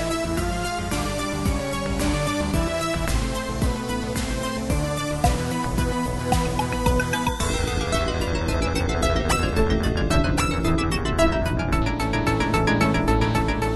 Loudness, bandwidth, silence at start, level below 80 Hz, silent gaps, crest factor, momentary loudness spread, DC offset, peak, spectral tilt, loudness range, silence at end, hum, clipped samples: -23 LUFS; 12.5 kHz; 0 s; -28 dBFS; none; 16 dB; 5 LU; under 0.1%; -6 dBFS; -5 dB/octave; 3 LU; 0 s; none; under 0.1%